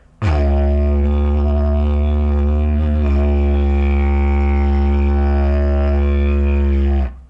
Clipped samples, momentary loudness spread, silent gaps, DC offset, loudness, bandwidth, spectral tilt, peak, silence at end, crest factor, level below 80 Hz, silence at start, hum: under 0.1%; 1 LU; none; under 0.1%; -17 LUFS; 5.2 kHz; -10 dB/octave; -4 dBFS; 0.1 s; 10 dB; -16 dBFS; 0.2 s; none